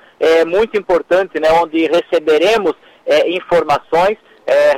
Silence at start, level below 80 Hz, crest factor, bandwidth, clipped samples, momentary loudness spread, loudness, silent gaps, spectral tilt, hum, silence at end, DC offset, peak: 0.2 s; -48 dBFS; 10 dB; 15 kHz; under 0.1%; 4 LU; -14 LUFS; none; -4.5 dB/octave; none; 0 s; under 0.1%; -4 dBFS